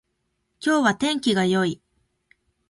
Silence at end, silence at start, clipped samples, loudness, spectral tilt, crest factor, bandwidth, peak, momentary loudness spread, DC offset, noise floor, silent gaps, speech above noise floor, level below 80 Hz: 0.95 s; 0.6 s; under 0.1%; -22 LUFS; -4.5 dB/octave; 20 dB; 11.5 kHz; -6 dBFS; 8 LU; under 0.1%; -74 dBFS; none; 53 dB; -62 dBFS